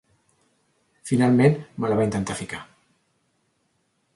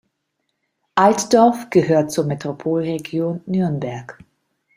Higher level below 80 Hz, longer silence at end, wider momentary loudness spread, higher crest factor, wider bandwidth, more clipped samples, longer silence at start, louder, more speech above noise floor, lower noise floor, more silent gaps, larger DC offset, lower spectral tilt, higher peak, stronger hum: about the same, -56 dBFS vs -60 dBFS; first, 1.5 s vs 0.65 s; first, 18 LU vs 10 LU; about the same, 20 dB vs 18 dB; second, 11.5 kHz vs 16 kHz; neither; about the same, 1.05 s vs 0.95 s; second, -22 LUFS vs -18 LUFS; second, 49 dB vs 56 dB; second, -70 dBFS vs -74 dBFS; neither; neither; about the same, -7 dB/octave vs -6 dB/octave; second, -6 dBFS vs -2 dBFS; neither